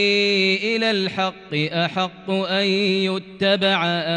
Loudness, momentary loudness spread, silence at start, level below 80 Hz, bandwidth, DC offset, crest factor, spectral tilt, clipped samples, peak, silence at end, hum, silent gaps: -20 LUFS; 7 LU; 0 s; -62 dBFS; 10 kHz; under 0.1%; 14 dB; -5 dB/octave; under 0.1%; -6 dBFS; 0 s; none; none